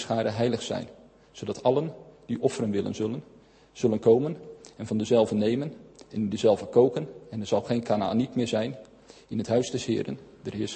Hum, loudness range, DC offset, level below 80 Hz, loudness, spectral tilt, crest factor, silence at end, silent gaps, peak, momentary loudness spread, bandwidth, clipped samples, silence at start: none; 4 LU; under 0.1%; -62 dBFS; -27 LUFS; -6.5 dB/octave; 20 dB; 0 s; none; -8 dBFS; 15 LU; 8.8 kHz; under 0.1%; 0 s